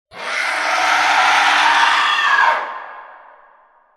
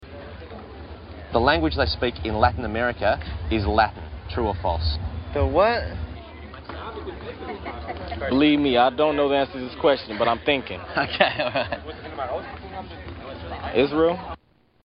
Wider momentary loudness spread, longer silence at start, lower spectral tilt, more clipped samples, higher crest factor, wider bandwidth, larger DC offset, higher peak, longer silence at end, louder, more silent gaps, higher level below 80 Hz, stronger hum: second, 12 LU vs 18 LU; first, 0.15 s vs 0 s; second, 1 dB/octave vs -10 dB/octave; neither; second, 16 dB vs 22 dB; first, 14.5 kHz vs 5.6 kHz; neither; about the same, 0 dBFS vs -2 dBFS; first, 0.85 s vs 0.5 s; first, -14 LUFS vs -23 LUFS; neither; second, -66 dBFS vs -36 dBFS; neither